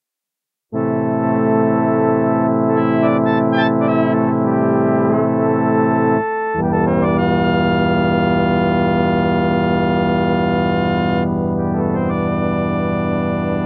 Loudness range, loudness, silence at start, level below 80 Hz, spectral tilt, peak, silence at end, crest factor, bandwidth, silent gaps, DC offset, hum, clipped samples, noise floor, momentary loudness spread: 2 LU; -16 LUFS; 0.7 s; -40 dBFS; -10.5 dB/octave; -4 dBFS; 0 s; 12 dB; 5.6 kHz; none; under 0.1%; none; under 0.1%; -84 dBFS; 4 LU